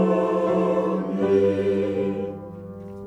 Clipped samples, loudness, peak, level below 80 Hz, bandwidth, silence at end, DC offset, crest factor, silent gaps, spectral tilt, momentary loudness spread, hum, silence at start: under 0.1%; -23 LUFS; -8 dBFS; -58 dBFS; 9 kHz; 0 s; under 0.1%; 16 dB; none; -8.5 dB/octave; 17 LU; none; 0 s